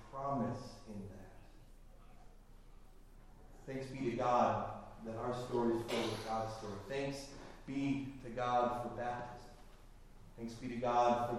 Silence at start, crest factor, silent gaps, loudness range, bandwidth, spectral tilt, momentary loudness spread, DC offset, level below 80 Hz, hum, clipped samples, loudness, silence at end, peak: 0 s; 20 dB; none; 10 LU; 15.5 kHz; -6 dB/octave; 18 LU; under 0.1%; -58 dBFS; none; under 0.1%; -39 LUFS; 0 s; -20 dBFS